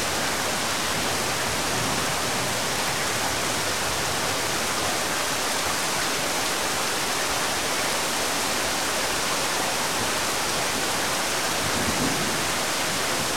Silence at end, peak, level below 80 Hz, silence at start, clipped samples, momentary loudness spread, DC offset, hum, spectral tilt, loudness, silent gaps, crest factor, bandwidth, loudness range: 0 s; -12 dBFS; -50 dBFS; 0 s; under 0.1%; 1 LU; 1%; none; -1.5 dB/octave; -23 LUFS; none; 14 dB; 16.5 kHz; 0 LU